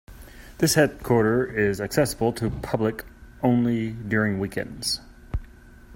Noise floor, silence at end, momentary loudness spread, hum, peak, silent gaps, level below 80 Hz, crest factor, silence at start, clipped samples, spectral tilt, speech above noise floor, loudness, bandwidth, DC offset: -47 dBFS; 0 s; 10 LU; none; -4 dBFS; none; -44 dBFS; 22 dB; 0.1 s; under 0.1%; -5 dB/octave; 24 dB; -24 LUFS; 16.5 kHz; under 0.1%